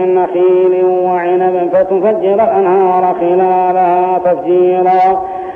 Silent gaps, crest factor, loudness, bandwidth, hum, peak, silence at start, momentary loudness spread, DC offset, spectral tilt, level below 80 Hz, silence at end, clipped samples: none; 8 dB; -11 LUFS; 3.8 kHz; none; -2 dBFS; 0 s; 3 LU; under 0.1%; -9 dB/octave; -54 dBFS; 0 s; under 0.1%